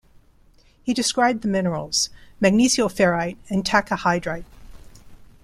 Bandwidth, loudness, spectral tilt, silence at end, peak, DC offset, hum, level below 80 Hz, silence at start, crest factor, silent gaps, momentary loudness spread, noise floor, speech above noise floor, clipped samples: 15 kHz; -21 LUFS; -4 dB/octave; 0.2 s; -2 dBFS; under 0.1%; none; -48 dBFS; 0.85 s; 20 dB; none; 9 LU; -54 dBFS; 33 dB; under 0.1%